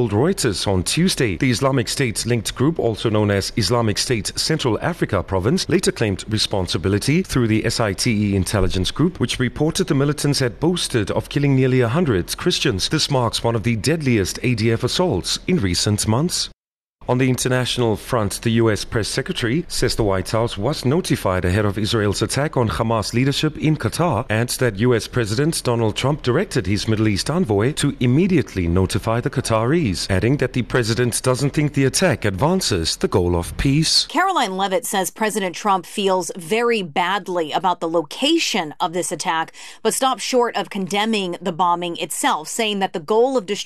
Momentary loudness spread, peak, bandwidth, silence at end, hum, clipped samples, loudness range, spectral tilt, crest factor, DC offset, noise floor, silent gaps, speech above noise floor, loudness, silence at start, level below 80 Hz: 4 LU; -4 dBFS; 13.5 kHz; 0 s; none; under 0.1%; 2 LU; -5 dB/octave; 14 dB; under 0.1%; -49 dBFS; 16.71-16.94 s; 30 dB; -19 LUFS; 0 s; -38 dBFS